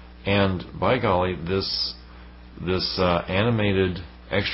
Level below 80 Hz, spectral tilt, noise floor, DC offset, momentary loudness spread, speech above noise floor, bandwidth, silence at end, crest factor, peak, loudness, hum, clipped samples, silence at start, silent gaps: -40 dBFS; -9 dB/octave; -44 dBFS; under 0.1%; 7 LU; 21 dB; 5.8 kHz; 0 s; 18 dB; -8 dBFS; -23 LUFS; none; under 0.1%; 0 s; none